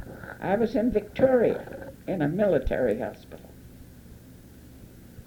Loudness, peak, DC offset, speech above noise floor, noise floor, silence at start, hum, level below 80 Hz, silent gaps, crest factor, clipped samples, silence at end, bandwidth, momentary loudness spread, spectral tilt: -26 LUFS; -8 dBFS; under 0.1%; 23 dB; -48 dBFS; 0 s; none; -46 dBFS; none; 20 dB; under 0.1%; 0.05 s; over 20 kHz; 21 LU; -8 dB/octave